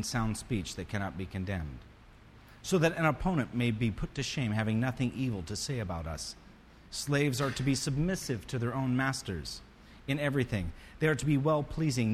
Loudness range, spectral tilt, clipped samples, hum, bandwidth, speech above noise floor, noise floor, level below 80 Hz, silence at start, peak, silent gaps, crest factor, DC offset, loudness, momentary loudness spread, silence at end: 2 LU; -5.5 dB/octave; under 0.1%; none; 14.5 kHz; 23 dB; -55 dBFS; -48 dBFS; 0 s; -14 dBFS; none; 18 dB; under 0.1%; -32 LUFS; 11 LU; 0 s